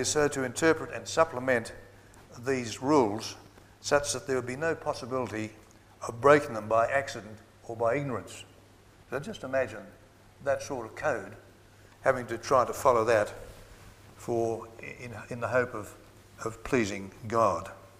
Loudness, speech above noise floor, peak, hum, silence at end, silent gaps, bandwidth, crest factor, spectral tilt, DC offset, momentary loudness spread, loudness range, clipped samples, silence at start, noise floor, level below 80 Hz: -29 LUFS; 27 dB; -6 dBFS; none; 0.15 s; none; 15.5 kHz; 24 dB; -4.5 dB/octave; under 0.1%; 17 LU; 6 LU; under 0.1%; 0 s; -56 dBFS; -58 dBFS